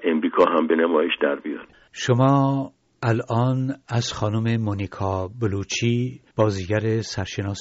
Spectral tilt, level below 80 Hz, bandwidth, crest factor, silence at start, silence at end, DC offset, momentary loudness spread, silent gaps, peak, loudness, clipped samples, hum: -6 dB/octave; -56 dBFS; 8 kHz; 16 dB; 0 s; 0 s; under 0.1%; 10 LU; none; -6 dBFS; -23 LUFS; under 0.1%; none